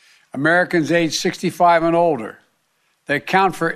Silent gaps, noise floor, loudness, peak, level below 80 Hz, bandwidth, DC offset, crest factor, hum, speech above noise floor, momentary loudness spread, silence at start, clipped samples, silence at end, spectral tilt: none; -65 dBFS; -17 LUFS; -2 dBFS; -56 dBFS; 14.5 kHz; under 0.1%; 16 dB; none; 48 dB; 9 LU; 0.35 s; under 0.1%; 0 s; -4.5 dB/octave